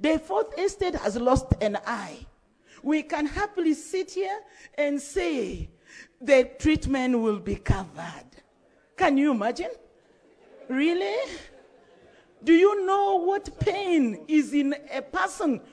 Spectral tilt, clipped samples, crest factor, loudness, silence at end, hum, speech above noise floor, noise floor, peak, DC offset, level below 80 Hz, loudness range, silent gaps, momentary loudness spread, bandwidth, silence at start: -6 dB/octave; under 0.1%; 20 dB; -26 LUFS; 0.1 s; none; 37 dB; -62 dBFS; -6 dBFS; under 0.1%; -44 dBFS; 5 LU; none; 15 LU; 11 kHz; 0 s